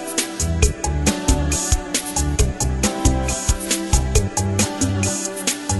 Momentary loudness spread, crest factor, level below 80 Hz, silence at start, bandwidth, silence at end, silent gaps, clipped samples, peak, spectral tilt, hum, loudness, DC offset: 3 LU; 20 dB; -24 dBFS; 0 s; 12.5 kHz; 0 s; none; under 0.1%; 0 dBFS; -4 dB/octave; none; -20 LUFS; under 0.1%